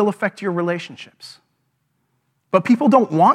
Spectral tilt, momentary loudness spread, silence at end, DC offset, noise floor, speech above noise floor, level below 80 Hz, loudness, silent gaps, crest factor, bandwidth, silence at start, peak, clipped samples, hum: -7 dB/octave; 23 LU; 0 s; under 0.1%; -69 dBFS; 51 dB; -76 dBFS; -18 LUFS; none; 20 dB; 12 kHz; 0 s; 0 dBFS; under 0.1%; none